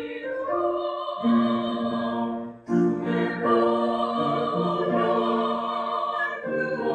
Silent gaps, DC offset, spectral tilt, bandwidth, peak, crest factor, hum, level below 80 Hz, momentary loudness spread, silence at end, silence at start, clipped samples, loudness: none; under 0.1%; -7.5 dB/octave; 8.4 kHz; -10 dBFS; 16 dB; none; -64 dBFS; 6 LU; 0 s; 0 s; under 0.1%; -25 LUFS